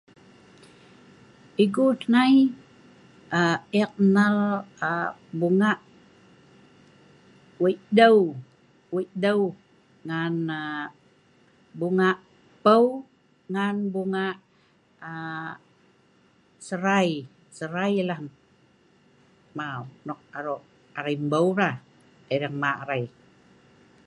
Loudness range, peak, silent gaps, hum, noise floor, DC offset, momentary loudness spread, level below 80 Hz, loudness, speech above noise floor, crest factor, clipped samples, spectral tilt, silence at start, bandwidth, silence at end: 9 LU; -4 dBFS; none; none; -62 dBFS; under 0.1%; 19 LU; -72 dBFS; -24 LUFS; 38 dB; 22 dB; under 0.1%; -6.5 dB/octave; 1.6 s; 11.5 kHz; 1 s